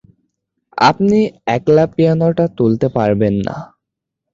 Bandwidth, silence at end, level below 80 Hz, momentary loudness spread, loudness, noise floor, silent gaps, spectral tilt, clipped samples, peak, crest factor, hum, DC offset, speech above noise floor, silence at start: 7.6 kHz; 0.7 s; -46 dBFS; 8 LU; -14 LUFS; -79 dBFS; none; -7.5 dB/octave; under 0.1%; 0 dBFS; 14 dB; none; under 0.1%; 66 dB; 0.75 s